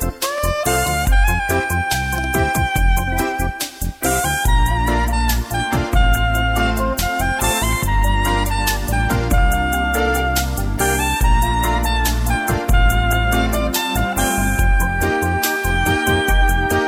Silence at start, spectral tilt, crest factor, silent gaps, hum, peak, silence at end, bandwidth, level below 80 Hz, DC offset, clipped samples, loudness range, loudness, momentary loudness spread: 0 s; -4 dB/octave; 14 dB; none; none; -4 dBFS; 0 s; over 20 kHz; -20 dBFS; under 0.1%; under 0.1%; 1 LU; -18 LUFS; 3 LU